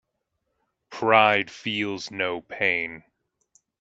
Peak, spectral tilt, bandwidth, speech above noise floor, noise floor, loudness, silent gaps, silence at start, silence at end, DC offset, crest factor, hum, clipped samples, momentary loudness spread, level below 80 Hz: -2 dBFS; -4 dB/octave; 8 kHz; 54 dB; -78 dBFS; -23 LUFS; none; 0.9 s; 0.8 s; under 0.1%; 24 dB; none; under 0.1%; 12 LU; -70 dBFS